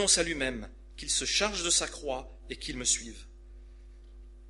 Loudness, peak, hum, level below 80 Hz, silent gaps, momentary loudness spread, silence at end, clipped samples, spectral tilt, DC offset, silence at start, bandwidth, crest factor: -29 LUFS; -12 dBFS; none; -48 dBFS; none; 18 LU; 0 s; under 0.1%; -1 dB/octave; under 0.1%; 0 s; 11.5 kHz; 22 dB